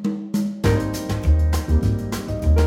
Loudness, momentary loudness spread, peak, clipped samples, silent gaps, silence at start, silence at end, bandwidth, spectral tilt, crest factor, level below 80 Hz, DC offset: -22 LUFS; 5 LU; -6 dBFS; under 0.1%; none; 0 s; 0 s; 15.5 kHz; -7 dB/octave; 14 dB; -22 dBFS; under 0.1%